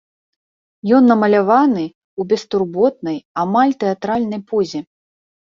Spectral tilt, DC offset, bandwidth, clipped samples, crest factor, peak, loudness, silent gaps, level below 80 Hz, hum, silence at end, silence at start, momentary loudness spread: -7 dB/octave; under 0.1%; 7.4 kHz; under 0.1%; 16 dB; -2 dBFS; -16 LUFS; 1.95-2.17 s, 3.25-3.35 s; -60 dBFS; none; 0.8 s; 0.85 s; 13 LU